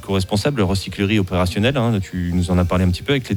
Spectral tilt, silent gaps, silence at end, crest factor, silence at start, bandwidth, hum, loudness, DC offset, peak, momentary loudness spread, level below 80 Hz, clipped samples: -6 dB/octave; none; 0 s; 16 dB; 0 s; 17.5 kHz; none; -19 LUFS; under 0.1%; -2 dBFS; 3 LU; -36 dBFS; under 0.1%